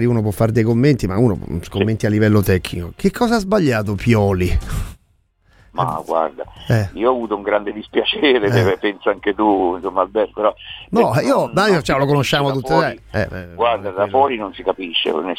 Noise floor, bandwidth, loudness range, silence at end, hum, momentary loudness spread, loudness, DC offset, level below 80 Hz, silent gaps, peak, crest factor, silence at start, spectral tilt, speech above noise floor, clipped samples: -59 dBFS; 16.5 kHz; 4 LU; 0 s; none; 8 LU; -18 LUFS; under 0.1%; -36 dBFS; none; -2 dBFS; 16 dB; 0 s; -6.5 dB/octave; 42 dB; under 0.1%